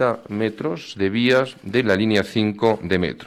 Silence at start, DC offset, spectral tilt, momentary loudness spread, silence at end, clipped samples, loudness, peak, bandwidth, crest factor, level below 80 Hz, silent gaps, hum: 0 s; under 0.1%; -6 dB/octave; 7 LU; 0 s; under 0.1%; -21 LUFS; -6 dBFS; 14 kHz; 14 dB; -54 dBFS; none; none